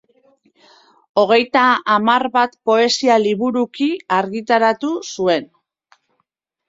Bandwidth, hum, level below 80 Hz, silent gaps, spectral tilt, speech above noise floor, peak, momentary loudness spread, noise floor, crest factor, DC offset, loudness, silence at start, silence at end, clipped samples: 7.8 kHz; none; -64 dBFS; none; -4 dB/octave; 55 dB; -2 dBFS; 7 LU; -71 dBFS; 16 dB; under 0.1%; -16 LUFS; 1.15 s; 1.25 s; under 0.1%